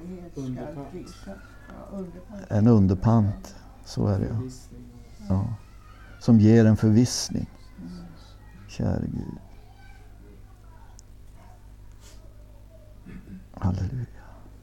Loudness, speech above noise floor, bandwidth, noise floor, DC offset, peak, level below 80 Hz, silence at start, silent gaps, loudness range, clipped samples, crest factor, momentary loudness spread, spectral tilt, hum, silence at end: -24 LUFS; 24 dB; 12.5 kHz; -47 dBFS; under 0.1%; -6 dBFS; -46 dBFS; 0 s; none; 13 LU; under 0.1%; 20 dB; 26 LU; -7 dB/octave; none; 0.05 s